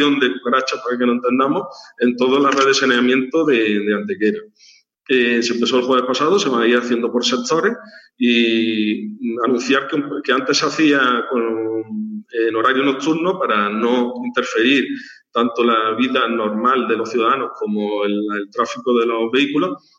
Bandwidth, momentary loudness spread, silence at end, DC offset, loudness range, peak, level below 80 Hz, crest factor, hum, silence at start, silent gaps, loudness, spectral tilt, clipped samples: 8 kHz; 7 LU; 0.2 s; under 0.1%; 2 LU; -2 dBFS; -72 dBFS; 16 dB; none; 0 s; none; -17 LUFS; -4 dB/octave; under 0.1%